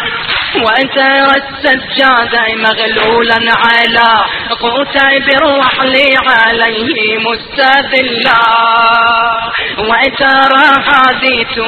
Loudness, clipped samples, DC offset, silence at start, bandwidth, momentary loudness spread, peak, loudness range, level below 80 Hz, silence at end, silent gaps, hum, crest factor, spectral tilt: -8 LUFS; 0.2%; under 0.1%; 0 s; 11 kHz; 6 LU; 0 dBFS; 1 LU; -40 dBFS; 0 s; none; none; 10 dB; -4.5 dB/octave